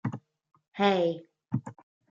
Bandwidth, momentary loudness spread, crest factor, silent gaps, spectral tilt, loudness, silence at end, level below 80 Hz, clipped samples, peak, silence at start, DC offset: 7.8 kHz; 21 LU; 22 dB; 0.68-0.72 s; -7 dB/octave; -29 LUFS; 0.4 s; -74 dBFS; under 0.1%; -10 dBFS; 0.05 s; under 0.1%